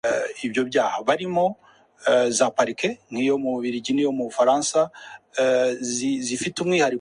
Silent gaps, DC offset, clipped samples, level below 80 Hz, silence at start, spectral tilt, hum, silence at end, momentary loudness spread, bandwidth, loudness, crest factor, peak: none; under 0.1%; under 0.1%; -66 dBFS; 0.05 s; -3.5 dB/octave; none; 0 s; 7 LU; 11 kHz; -23 LUFS; 18 dB; -4 dBFS